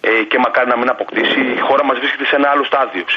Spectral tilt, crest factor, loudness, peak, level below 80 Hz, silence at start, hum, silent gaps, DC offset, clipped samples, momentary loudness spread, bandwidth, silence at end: 0 dB/octave; 12 dB; -14 LUFS; -2 dBFS; -62 dBFS; 0.05 s; none; none; under 0.1%; under 0.1%; 3 LU; 7.2 kHz; 0 s